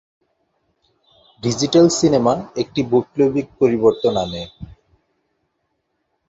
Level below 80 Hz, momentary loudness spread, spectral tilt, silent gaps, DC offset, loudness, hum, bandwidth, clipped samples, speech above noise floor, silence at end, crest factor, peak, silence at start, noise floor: -50 dBFS; 12 LU; -5.5 dB/octave; none; under 0.1%; -17 LUFS; none; 8 kHz; under 0.1%; 54 dB; 1.6 s; 18 dB; -2 dBFS; 1.45 s; -71 dBFS